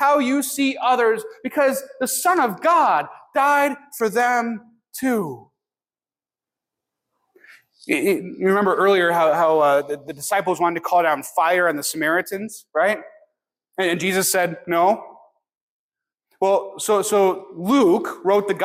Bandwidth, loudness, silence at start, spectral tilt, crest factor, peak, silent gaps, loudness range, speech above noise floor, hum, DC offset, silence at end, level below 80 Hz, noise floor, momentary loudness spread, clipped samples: 16.5 kHz; -20 LUFS; 0 s; -3.5 dB/octave; 14 dB; -6 dBFS; 15.57-15.90 s; 7 LU; over 71 dB; none; under 0.1%; 0 s; -70 dBFS; under -90 dBFS; 10 LU; under 0.1%